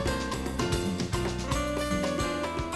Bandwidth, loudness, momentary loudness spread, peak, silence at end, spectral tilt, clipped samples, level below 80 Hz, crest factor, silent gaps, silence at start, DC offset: 13 kHz; -30 LUFS; 2 LU; -14 dBFS; 0 s; -5 dB/octave; under 0.1%; -38 dBFS; 16 dB; none; 0 s; 0.2%